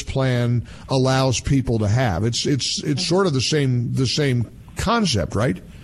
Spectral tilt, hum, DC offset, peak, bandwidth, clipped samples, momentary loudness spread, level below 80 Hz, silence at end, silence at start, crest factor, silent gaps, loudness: -5 dB/octave; none; under 0.1%; -6 dBFS; 12.5 kHz; under 0.1%; 5 LU; -40 dBFS; 0 s; 0 s; 14 dB; none; -20 LUFS